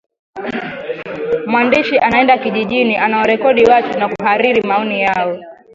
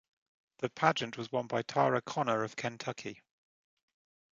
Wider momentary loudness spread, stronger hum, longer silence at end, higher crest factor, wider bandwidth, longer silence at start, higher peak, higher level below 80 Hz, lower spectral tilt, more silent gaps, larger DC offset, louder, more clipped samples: first, 13 LU vs 10 LU; neither; second, 0.2 s vs 1.2 s; second, 14 dB vs 26 dB; second, 7.6 kHz vs 9 kHz; second, 0.35 s vs 0.6 s; first, 0 dBFS vs -10 dBFS; first, -52 dBFS vs -76 dBFS; about the same, -6 dB/octave vs -5 dB/octave; neither; neither; first, -14 LUFS vs -33 LUFS; neither